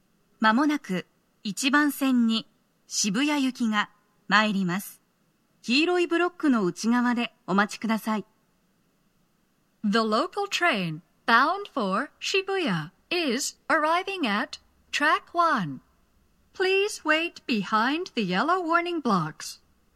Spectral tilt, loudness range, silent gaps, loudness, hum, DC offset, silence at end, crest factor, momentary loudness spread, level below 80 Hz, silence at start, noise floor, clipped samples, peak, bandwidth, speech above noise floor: -4 dB/octave; 3 LU; none; -25 LUFS; none; under 0.1%; 0.4 s; 22 dB; 10 LU; -72 dBFS; 0.4 s; -68 dBFS; under 0.1%; -6 dBFS; 14 kHz; 44 dB